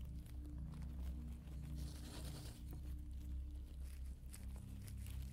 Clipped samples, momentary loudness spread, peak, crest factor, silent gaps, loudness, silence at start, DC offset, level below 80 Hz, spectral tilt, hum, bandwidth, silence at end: under 0.1%; 3 LU; -34 dBFS; 16 dB; none; -52 LUFS; 0 s; under 0.1%; -50 dBFS; -6 dB/octave; none; 16 kHz; 0 s